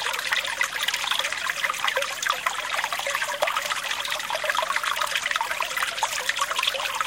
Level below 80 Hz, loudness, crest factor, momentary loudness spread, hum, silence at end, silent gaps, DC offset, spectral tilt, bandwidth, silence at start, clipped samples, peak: -64 dBFS; -25 LUFS; 24 dB; 2 LU; none; 0 s; none; under 0.1%; 1.5 dB/octave; 17 kHz; 0 s; under 0.1%; -2 dBFS